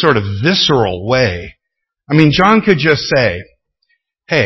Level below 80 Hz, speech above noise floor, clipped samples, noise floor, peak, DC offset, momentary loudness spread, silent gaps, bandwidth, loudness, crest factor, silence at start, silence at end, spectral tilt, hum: -38 dBFS; 65 dB; 0.1%; -77 dBFS; 0 dBFS; under 0.1%; 7 LU; none; 8 kHz; -12 LUFS; 14 dB; 0 s; 0 s; -5.5 dB/octave; none